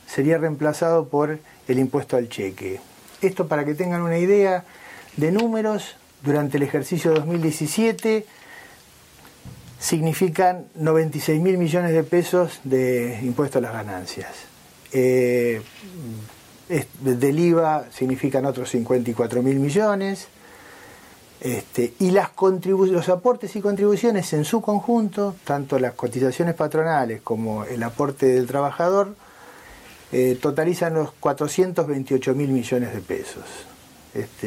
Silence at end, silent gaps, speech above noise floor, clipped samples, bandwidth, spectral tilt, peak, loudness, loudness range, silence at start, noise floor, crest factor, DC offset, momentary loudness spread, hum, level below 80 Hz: 0 s; none; 28 dB; under 0.1%; 16 kHz; -6.5 dB/octave; -6 dBFS; -22 LUFS; 3 LU; 0.1 s; -49 dBFS; 16 dB; under 0.1%; 13 LU; none; -62 dBFS